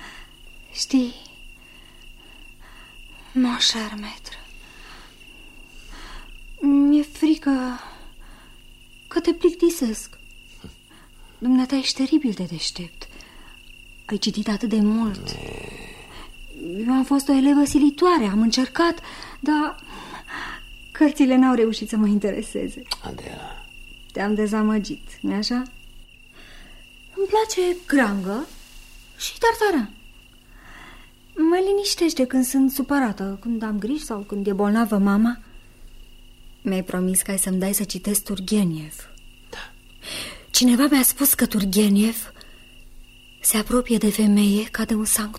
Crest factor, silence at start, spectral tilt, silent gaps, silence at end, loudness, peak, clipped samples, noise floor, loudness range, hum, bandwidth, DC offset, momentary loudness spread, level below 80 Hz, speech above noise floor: 16 dB; 0 s; -4 dB/octave; none; 0 s; -21 LUFS; -6 dBFS; under 0.1%; -48 dBFS; 7 LU; none; 16 kHz; under 0.1%; 21 LU; -44 dBFS; 27 dB